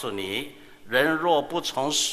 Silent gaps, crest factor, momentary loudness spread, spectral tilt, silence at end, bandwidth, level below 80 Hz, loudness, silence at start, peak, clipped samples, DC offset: none; 20 dB; 9 LU; -2 dB/octave; 0 s; 15.5 kHz; -62 dBFS; -25 LUFS; 0 s; -6 dBFS; under 0.1%; under 0.1%